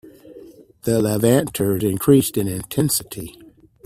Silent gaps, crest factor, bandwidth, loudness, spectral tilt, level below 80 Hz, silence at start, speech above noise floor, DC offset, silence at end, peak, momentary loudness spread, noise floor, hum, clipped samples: none; 18 dB; 16 kHz; -19 LUFS; -5.5 dB/octave; -50 dBFS; 0.05 s; 25 dB; under 0.1%; 0.55 s; -2 dBFS; 15 LU; -44 dBFS; none; under 0.1%